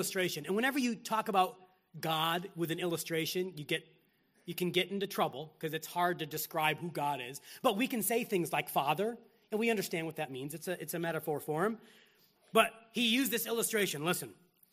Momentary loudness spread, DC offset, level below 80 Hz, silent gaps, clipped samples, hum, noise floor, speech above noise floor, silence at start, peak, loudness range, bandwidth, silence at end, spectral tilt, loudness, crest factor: 9 LU; under 0.1%; -80 dBFS; none; under 0.1%; none; -71 dBFS; 37 dB; 0 s; -10 dBFS; 3 LU; 15.5 kHz; 0.4 s; -3.5 dB/octave; -34 LUFS; 26 dB